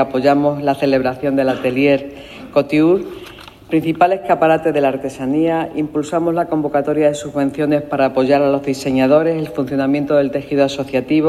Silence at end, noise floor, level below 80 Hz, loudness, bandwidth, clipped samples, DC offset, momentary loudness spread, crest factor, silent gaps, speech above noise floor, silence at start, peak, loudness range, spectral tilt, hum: 0 s; -37 dBFS; -50 dBFS; -16 LUFS; 13.5 kHz; under 0.1%; under 0.1%; 6 LU; 14 dB; none; 21 dB; 0 s; 0 dBFS; 1 LU; -6.5 dB/octave; none